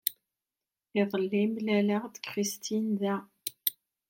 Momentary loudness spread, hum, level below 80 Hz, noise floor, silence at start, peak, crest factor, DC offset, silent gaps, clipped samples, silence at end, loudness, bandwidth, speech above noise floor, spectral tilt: 7 LU; none; -82 dBFS; under -90 dBFS; 0.05 s; -8 dBFS; 22 dB; under 0.1%; none; under 0.1%; 0.35 s; -31 LUFS; 17 kHz; over 61 dB; -4.5 dB/octave